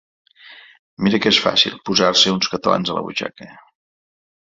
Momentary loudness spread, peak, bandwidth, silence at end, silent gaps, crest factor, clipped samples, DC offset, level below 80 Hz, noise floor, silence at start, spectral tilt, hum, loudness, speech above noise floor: 11 LU; 0 dBFS; 7.8 kHz; 0.95 s; 0.79-0.97 s; 20 dB; under 0.1%; under 0.1%; -56 dBFS; -44 dBFS; 0.5 s; -3.5 dB/octave; none; -16 LUFS; 26 dB